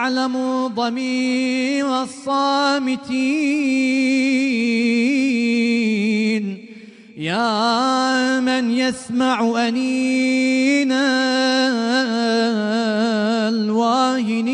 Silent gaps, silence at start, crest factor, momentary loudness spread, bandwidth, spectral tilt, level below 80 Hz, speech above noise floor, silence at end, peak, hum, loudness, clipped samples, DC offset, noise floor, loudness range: none; 0 s; 12 dB; 4 LU; 10.5 kHz; -4 dB/octave; -68 dBFS; 22 dB; 0 s; -6 dBFS; none; -18 LUFS; under 0.1%; under 0.1%; -40 dBFS; 2 LU